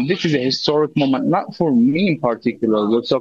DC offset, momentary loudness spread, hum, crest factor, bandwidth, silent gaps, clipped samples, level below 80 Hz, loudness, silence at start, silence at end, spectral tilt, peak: under 0.1%; 4 LU; none; 16 dB; 7.4 kHz; none; under 0.1%; -60 dBFS; -18 LUFS; 0 s; 0 s; -6.5 dB/octave; -2 dBFS